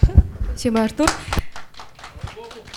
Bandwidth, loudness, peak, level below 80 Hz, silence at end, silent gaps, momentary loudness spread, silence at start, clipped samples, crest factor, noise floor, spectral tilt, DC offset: 19 kHz; -21 LUFS; 0 dBFS; -24 dBFS; 0 s; none; 21 LU; 0 s; under 0.1%; 20 dB; -39 dBFS; -5.5 dB/octave; under 0.1%